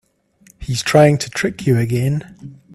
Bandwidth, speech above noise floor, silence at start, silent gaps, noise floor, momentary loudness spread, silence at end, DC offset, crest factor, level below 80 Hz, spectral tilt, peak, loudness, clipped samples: 14 kHz; 36 dB; 0.6 s; none; -52 dBFS; 14 LU; 0.2 s; under 0.1%; 18 dB; -44 dBFS; -6 dB/octave; 0 dBFS; -16 LUFS; under 0.1%